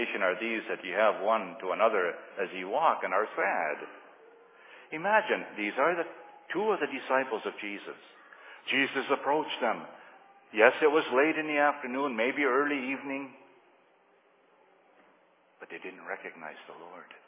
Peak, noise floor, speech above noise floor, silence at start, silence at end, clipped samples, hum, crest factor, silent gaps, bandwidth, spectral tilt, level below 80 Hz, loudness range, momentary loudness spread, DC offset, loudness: -6 dBFS; -65 dBFS; 35 dB; 0 s; 0.1 s; under 0.1%; none; 24 dB; none; 3.9 kHz; -1 dB/octave; under -90 dBFS; 15 LU; 18 LU; under 0.1%; -29 LUFS